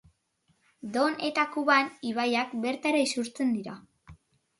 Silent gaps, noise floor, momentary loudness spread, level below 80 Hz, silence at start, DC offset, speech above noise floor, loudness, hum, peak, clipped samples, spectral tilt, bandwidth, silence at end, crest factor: none; -72 dBFS; 10 LU; -68 dBFS; 0.85 s; under 0.1%; 44 dB; -28 LUFS; none; -10 dBFS; under 0.1%; -3.5 dB/octave; 11.5 kHz; 0.45 s; 20 dB